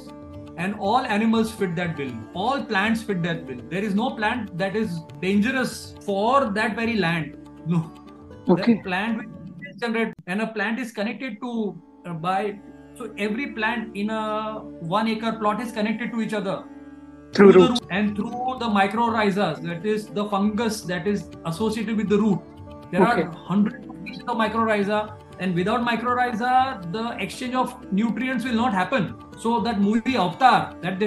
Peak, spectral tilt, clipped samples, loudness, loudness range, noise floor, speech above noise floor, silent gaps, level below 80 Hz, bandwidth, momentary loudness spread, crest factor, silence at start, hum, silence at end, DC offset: 0 dBFS; -6 dB/octave; under 0.1%; -23 LUFS; 7 LU; -43 dBFS; 20 dB; none; -56 dBFS; 12.5 kHz; 11 LU; 22 dB; 0 s; none; 0 s; under 0.1%